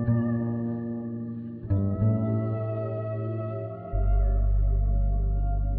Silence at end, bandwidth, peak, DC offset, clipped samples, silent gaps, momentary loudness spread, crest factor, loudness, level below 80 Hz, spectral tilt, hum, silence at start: 0 s; 2.8 kHz; -14 dBFS; under 0.1%; under 0.1%; none; 8 LU; 12 dB; -29 LUFS; -28 dBFS; -13.5 dB/octave; none; 0 s